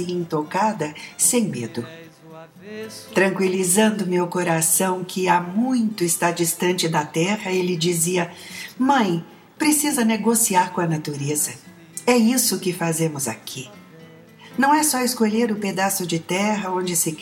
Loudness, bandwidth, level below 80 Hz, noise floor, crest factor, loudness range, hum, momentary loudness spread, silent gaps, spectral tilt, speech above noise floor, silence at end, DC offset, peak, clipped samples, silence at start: -20 LUFS; 17.5 kHz; -68 dBFS; -45 dBFS; 18 dB; 3 LU; none; 13 LU; none; -3.5 dB/octave; 24 dB; 0 s; under 0.1%; -4 dBFS; under 0.1%; 0 s